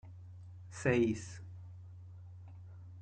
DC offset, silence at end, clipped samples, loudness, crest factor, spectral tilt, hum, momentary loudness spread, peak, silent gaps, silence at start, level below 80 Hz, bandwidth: under 0.1%; 0 s; under 0.1%; -34 LUFS; 22 dB; -6.5 dB/octave; none; 21 LU; -18 dBFS; none; 0.05 s; -68 dBFS; 9.2 kHz